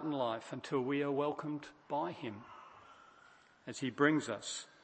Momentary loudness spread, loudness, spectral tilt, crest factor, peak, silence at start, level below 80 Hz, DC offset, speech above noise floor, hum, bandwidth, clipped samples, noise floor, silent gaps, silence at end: 22 LU; -37 LUFS; -5 dB/octave; 24 dB; -16 dBFS; 0 s; -82 dBFS; under 0.1%; 27 dB; none; 8.8 kHz; under 0.1%; -63 dBFS; none; 0.2 s